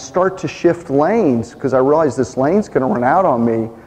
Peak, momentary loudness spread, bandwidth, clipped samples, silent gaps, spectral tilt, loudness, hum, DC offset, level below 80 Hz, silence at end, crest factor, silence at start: -2 dBFS; 4 LU; 9.6 kHz; under 0.1%; none; -7 dB/octave; -15 LUFS; none; under 0.1%; -48 dBFS; 0.05 s; 14 dB; 0 s